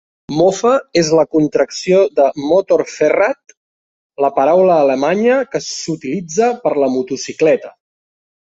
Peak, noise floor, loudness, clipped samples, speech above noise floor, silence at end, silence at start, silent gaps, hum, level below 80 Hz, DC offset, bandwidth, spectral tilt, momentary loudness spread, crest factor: -2 dBFS; under -90 dBFS; -14 LUFS; under 0.1%; over 76 dB; 0.85 s; 0.3 s; 3.57-4.10 s; none; -56 dBFS; under 0.1%; 8 kHz; -5 dB/octave; 9 LU; 14 dB